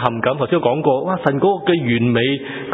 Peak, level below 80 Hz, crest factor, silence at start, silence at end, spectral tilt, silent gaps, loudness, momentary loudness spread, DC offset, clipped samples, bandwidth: 0 dBFS; -54 dBFS; 18 dB; 0 s; 0 s; -9.5 dB/octave; none; -17 LUFS; 3 LU; under 0.1%; under 0.1%; 4 kHz